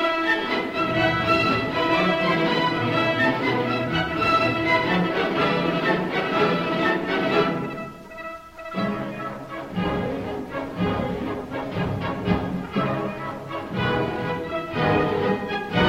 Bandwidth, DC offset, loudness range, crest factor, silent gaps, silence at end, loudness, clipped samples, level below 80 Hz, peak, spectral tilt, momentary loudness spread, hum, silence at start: 16 kHz; under 0.1%; 7 LU; 16 dB; none; 0 s; -23 LUFS; under 0.1%; -46 dBFS; -6 dBFS; -6.5 dB/octave; 11 LU; none; 0 s